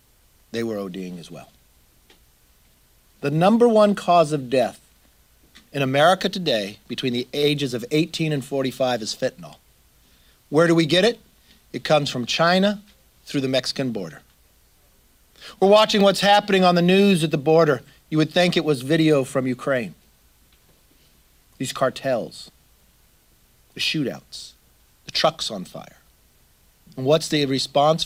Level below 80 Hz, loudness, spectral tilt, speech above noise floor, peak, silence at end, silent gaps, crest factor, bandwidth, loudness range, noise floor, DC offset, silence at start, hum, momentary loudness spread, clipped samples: -58 dBFS; -20 LUFS; -5 dB/octave; 38 dB; -4 dBFS; 0 s; none; 18 dB; 16.5 kHz; 10 LU; -58 dBFS; under 0.1%; 0.55 s; none; 18 LU; under 0.1%